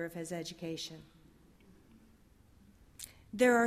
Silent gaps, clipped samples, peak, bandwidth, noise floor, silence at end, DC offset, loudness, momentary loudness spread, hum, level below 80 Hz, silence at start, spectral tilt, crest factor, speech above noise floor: none; under 0.1%; -16 dBFS; 15.5 kHz; -63 dBFS; 0 s; under 0.1%; -37 LUFS; 22 LU; none; -68 dBFS; 0 s; -4 dB/octave; 20 dB; 30 dB